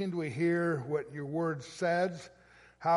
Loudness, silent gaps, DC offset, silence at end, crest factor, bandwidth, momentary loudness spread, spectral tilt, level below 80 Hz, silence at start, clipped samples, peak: -33 LUFS; none; under 0.1%; 0 s; 16 dB; 11.5 kHz; 7 LU; -6.5 dB/octave; -70 dBFS; 0 s; under 0.1%; -18 dBFS